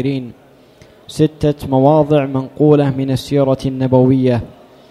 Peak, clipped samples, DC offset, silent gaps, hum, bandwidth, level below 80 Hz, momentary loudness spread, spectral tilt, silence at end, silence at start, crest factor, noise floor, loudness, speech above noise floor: 0 dBFS; under 0.1%; under 0.1%; none; none; 13.5 kHz; -42 dBFS; 10 LU; -8 dB/octave; 0.4 s; 0 s; 14 dB; -44 dBFS; -14 LUFS; 31 dB